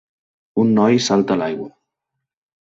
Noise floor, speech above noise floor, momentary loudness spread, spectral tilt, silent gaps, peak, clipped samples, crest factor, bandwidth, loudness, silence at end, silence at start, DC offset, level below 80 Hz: -80 dBFS; 64 dB; 13 LU; -5.5 dB/octave; none; -4 dBFS; under 0.1%; 16 dB; 7.8 kHz; -17 LUFS; 0.95 s; 0.55 s; under 0.1%; -58 dBFS